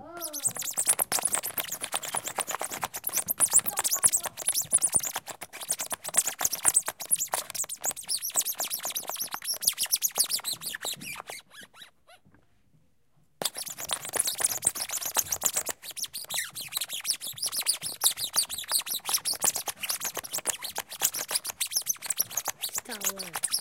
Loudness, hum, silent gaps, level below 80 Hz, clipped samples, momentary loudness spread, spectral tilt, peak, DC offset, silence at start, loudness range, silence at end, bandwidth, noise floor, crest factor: -27 LUFS; none; none; -68 dBFS; under 0.1%; 10 LU; 1 dB/octave; -6 dBFS; under 0.1%; 0 s; 6 LU; 0 s; 17 kHz; -69 dBFS; 26 dB